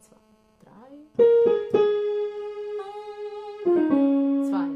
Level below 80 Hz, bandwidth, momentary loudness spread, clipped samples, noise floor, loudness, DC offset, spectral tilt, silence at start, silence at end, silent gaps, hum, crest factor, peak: -68 dBFS; 7.6 kHz; 17 LU; under 0.1%; -59 dBFS; -23 LUFS; under 0.1%; -7.5 dB/octave; 0.75 s; 0 s; none; none; 16 dB; -8 dBFS